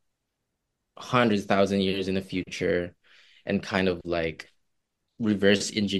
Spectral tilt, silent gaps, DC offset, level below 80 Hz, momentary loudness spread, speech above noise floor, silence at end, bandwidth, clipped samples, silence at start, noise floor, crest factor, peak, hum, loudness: -5 dB/octave; none; under 0.1%; -58 dBFS; 11 LU; 55 dB; 0 s; 12.5 kHz; under 0.1%; 1 s; -81 dBFS; 22 dB; -6 dBFS; none; -26 LUFS